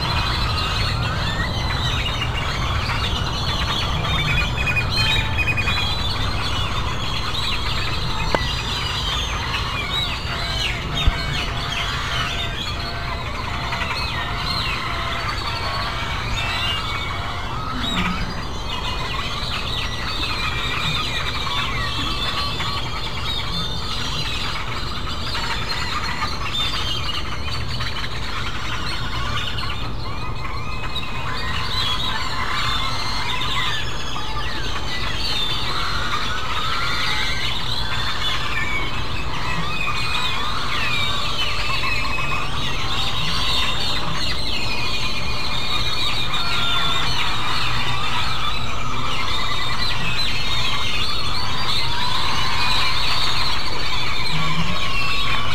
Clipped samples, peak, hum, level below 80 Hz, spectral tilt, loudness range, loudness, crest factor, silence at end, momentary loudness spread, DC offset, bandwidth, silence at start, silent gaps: under 0.1%; 0 dBFS; none; -30 dBFS; -3.5 dB/octave; 4 LU; -22 LUFS; 20 dB; 0 s; 6 LU; 6%; 16 kHz; 0 s; none